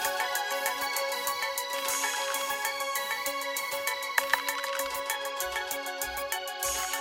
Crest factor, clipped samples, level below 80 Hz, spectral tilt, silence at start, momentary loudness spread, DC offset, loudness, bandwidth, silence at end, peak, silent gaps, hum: 26 dB; under 0.1%; -62 dBFS; 1 dB/octave; 0 s; 4 LU; under 0.1%; -30 LUFS; 17 kHz; 0 s; -6 dBFS; none; none